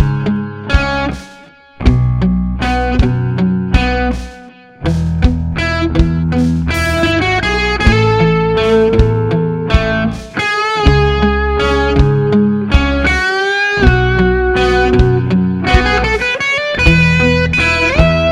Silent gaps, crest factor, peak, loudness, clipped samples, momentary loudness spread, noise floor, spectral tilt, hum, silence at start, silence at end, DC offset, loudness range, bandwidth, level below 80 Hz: none; 12 dB; 0 dBFS; -13 LUFS; 0.1%; 6 LU; -39 dBFS; -6.5 dB/octave; none; 0 s; 0 s; under 0.1%; 4 LU; 12 kHz; -20 dBFS